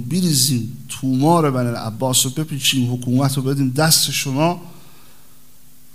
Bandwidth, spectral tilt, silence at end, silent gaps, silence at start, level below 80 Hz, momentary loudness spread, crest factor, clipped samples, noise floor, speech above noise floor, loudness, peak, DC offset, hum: 16 kHz; -4 dB/octave; 1.2 s; none; 0 s; -58 dBFS; 9 LU; 20 dB; under 0.1%; -50 dBFS; 33 dB; -17 LUFS; 0 dBFS; 1%; none